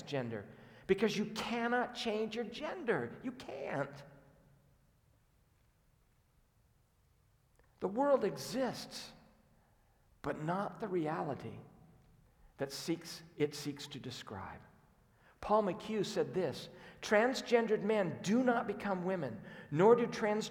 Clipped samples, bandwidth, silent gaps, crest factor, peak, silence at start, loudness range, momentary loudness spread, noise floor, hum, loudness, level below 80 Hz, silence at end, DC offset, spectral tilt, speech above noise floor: under 0.1%; 18 kHz; none; 22 dB; -16 dBFS; 0 s; 9 LU; 16 LU; -71 dBFS; none; -36 LUFS; -70 dBFS; 0 s; under 0.1%; -5.5 dB/octave; 36 dB